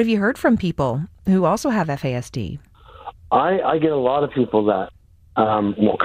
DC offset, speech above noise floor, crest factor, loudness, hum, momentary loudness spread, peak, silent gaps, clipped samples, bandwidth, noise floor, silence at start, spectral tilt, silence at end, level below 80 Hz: under 0.1%; 20 dB; 16 dB; -20 LUFS; none; 13 LU; -4 dBFS; none; under 0.1%; 15.5 kHz; -39 dBFS; 0 s; -7 dB/octave; 0 s; -46 dBFS